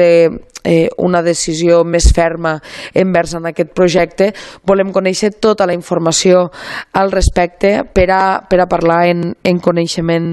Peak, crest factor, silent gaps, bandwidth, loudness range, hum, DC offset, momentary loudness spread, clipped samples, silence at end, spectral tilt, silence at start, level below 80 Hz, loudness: 0 dBFS; 12 dB; none; 12.5 kHz; 1 LU; none; under 0.1%; 7 LU; under 0.1%; 0 s; -5 dB/octave; 0 s; -24 dBFS; -13 LUFS